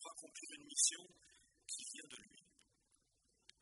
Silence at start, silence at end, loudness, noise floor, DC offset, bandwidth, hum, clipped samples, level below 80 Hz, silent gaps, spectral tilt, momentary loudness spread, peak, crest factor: 0 s; 1.2 s; -41 LUFS; -80 dBFS; under 0.1%; 11.5 kHz; none; under 0.1%; -88 dBFS; none; 2 dB/octave; 21 LU; -20 dBFS; 28 dB